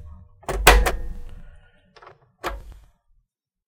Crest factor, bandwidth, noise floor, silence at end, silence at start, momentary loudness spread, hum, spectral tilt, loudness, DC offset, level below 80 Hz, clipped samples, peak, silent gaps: 24 dB; 17.5 kHz; -69 dBFS; 0.95 s; 0 s; 25 LU; none; -3 dB/octave; -20 LUFS; under 0.1%; -28 dBFS; under 0.1%; 0 dBFS; none